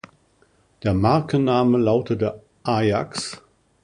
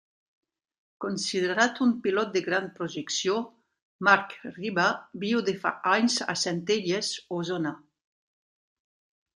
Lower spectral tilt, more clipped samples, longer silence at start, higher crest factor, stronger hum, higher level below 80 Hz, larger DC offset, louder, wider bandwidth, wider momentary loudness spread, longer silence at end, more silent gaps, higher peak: first, -6.5 dB/octave vs -3.5 dB/octave; neither; second, 0.85 s vs 1 s; second, 18 dB vs 24 dB; neither; first, -46 dBFS vs -76 dBFS; neither; first, -21 LUFS vs -27 LUFS; about the same, 11 kHz vs 11 kHz; about the same, 12 LU vs 11 LU; second, 0.45 s vs 1.55 s; second, none vs 3.82-3.99 s; about the same, -4 dBFS vs -4 dBFS